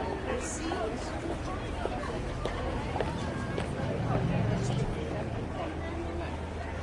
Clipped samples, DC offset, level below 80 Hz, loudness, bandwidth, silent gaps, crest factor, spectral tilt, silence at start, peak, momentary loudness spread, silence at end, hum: under 0.1%; under 0.1%; -42 dBFS; -34 LUFS; 11.5 kHz; none; 18 dB; -6 dB/octave; 0 s; -16 dBFS; 6 LU; 0 s; none